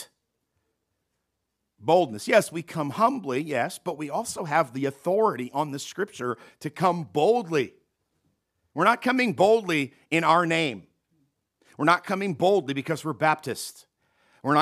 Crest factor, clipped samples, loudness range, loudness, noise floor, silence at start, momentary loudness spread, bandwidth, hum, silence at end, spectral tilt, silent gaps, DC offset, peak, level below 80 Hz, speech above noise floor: 20 dB; under 0.1%; 4 LU; -25 LUFS; -80 dBFS; 0 s; 12 LU; 15.5 kHz; none; 0 s; -5 dB/octave; none; under 0.1%; -6 dBFS; -74 dBFS; 55 dB